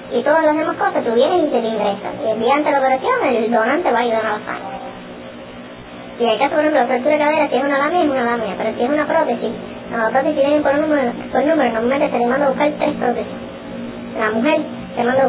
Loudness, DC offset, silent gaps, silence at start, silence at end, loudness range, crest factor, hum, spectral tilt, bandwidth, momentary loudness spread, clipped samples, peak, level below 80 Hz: -17 LUFS; under 0.1%; none; 0 s; 0 s; 3 LU; 14 dB; none; -9 dB/octave; 4 kHz; 14 LU; under 0.1%; -2 dBFS; -52 dBFS